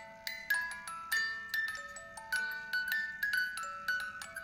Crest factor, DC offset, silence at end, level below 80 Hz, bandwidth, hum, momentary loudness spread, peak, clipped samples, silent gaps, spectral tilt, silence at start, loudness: 20 dB; under 0.1%; 0 s; -70 dBFS; 17 kHz; none; 9 LU; -18 dBFS; under 0.1%; none; 0.5 dB/octave; 0 s; -36 LUFS